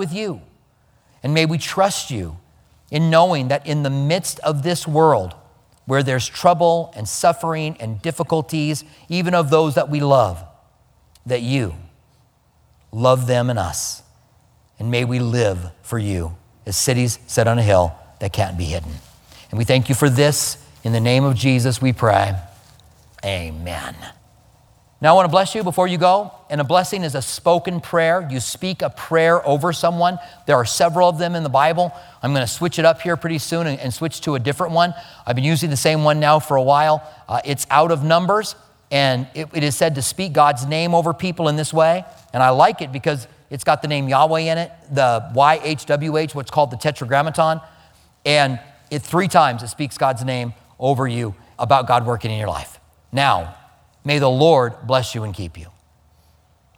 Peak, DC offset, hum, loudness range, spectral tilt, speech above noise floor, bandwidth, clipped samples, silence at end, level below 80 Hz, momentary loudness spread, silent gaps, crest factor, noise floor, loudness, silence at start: 0 dBFS; under 0.1%; none; 4 LU; -5 dB/octave; 40 dB; 18.5 kHz; under 0.1%; 1.1 s; -46 dBFS; 12 LU; none; 18 dB; -57 dBFS; -18 LUFS; 0 s